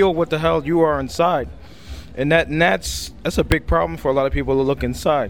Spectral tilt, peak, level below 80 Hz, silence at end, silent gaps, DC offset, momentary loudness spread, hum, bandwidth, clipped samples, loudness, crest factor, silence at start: -5.5 dB/octave; -2 dBFS; -32 dBFS; 0 s; none; 0.7%; 8 LU; none; 17.5 kHz; under 0.1%; -19 LUFS; 16 dB; 0 s